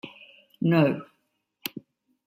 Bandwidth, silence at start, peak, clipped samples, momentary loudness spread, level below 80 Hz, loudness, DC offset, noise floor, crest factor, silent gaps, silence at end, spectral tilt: 16 kHz; 0.05 s; -8 dBFS; under 0.1%; 21 LU; -72 dBFS; -26 LUFS; under 0.1%; -75 dBFS; 20 dB; none; 0.5 s; -7.5 dB/octave